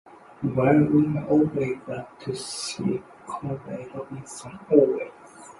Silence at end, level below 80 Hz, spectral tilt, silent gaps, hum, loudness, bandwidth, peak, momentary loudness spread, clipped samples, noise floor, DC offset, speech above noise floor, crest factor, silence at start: 0.1 s; -58 dBFS; -6.5 dB/octave; none; none; -24 LUFS; 11.5 kHz; -4 dBFS; 17 LU; under 0.1%; -46 dBFS; under 0.1%; 22 dB; 22 dB; 0.4 s